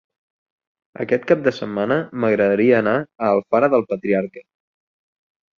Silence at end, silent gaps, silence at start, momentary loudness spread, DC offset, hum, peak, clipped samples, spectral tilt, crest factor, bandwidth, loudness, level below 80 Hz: 1.2 s; none; 1 s; 7 LU; under 0.1%; none; -2 dBFS; under 0.1%; -8 dB/octave; 18 dB; 7 kHz; -19 LUFS; -62 dBFS